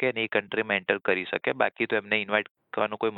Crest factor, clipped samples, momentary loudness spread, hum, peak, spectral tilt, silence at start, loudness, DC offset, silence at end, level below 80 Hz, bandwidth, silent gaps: 22 dB; under 0.1%; 4 LU; none; -6 dBFS; -8 dB/octave; 0 s; -27 LUFS; under 0.1%; 0 s; -72 dBFS; 4.3 kHz; 2.51-2.55 s